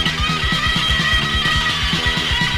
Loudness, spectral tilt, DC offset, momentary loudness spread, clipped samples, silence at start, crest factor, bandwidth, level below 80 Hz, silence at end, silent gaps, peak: -16 LUFS; -3 dB/octave; under 0.1%; 2 LU; under 0.1%; 0 s; 14 dB; 16 kHz; -26 dBFS; 0 s; none; -4 dBFS